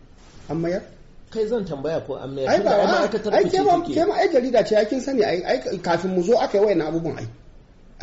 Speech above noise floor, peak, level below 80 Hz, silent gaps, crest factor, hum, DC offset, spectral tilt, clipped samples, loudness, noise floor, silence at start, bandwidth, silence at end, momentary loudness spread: 26 dB; -8 dBFS; -48 dBFS; none; 14 dB; none; under 0.1%; -4.5 dB/octave; under 0.1%; -21 LUFS; -46 dBFS; 0.35 s; 8 kHz; 0 s; 10 LU